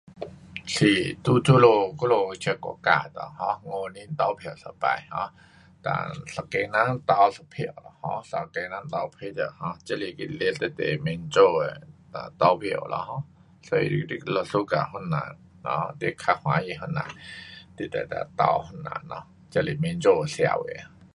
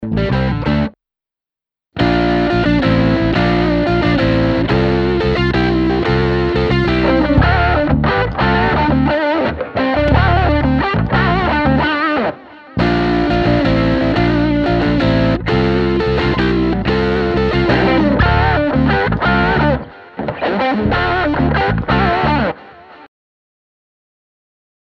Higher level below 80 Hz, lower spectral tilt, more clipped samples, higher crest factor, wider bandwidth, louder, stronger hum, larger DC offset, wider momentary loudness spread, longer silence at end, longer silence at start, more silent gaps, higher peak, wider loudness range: second, -58 dBFS vs -26 dBFS; second, -6 dB/octave vs -8 dB/octave; neither; first, 22 dB vs 14 dB; first, 11.5 kHz vs 7.4 kHz; second, -26 LUFS vs -14 LUFS; neither; neither; first, 16 LU vs 5 LU; second, 0.3 s vs 1.85 s; about the same, 0.1 s vs 0 s; neither; second, -4 dBFS vs 0 dBFS; first, 7 LU vs 2 LU